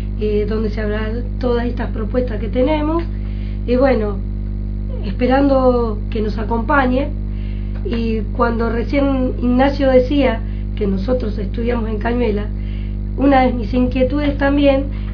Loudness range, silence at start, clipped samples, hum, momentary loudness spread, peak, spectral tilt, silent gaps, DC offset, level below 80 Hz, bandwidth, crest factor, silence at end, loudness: 3 LU; 0 s; under 0.1%; 50 Hz at -20 dBFS; 11 LU; 0 dBFS; -9.5 dB/octave; none; under 0.1%; -22 dBFS; 5.4 kHz; 16 dB; 0 s; -18 LUFS